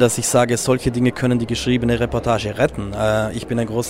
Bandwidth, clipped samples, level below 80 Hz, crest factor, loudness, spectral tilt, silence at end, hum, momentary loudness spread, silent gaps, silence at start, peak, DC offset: 16 kHz; under 0.1%; -38 dBFS; 16 dB; -19 LUFS; -5 dB/octave; 0 s; none; 5 LU; none; 0 s; -2 dBFS; under 0.1%